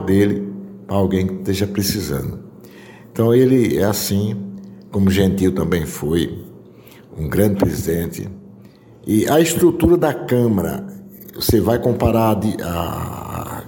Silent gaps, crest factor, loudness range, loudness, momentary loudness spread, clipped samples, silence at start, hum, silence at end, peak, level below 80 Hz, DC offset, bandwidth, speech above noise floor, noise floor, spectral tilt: none; 16 dB; 4 LU; -18 LUFS; 16 LU; under 0.1%; 0 s; none; 0 s; -2 dBFS; -38 dBFS; under 0.1%; 17 kHz; 26 dB; -43 dBFS; -6 dB/octave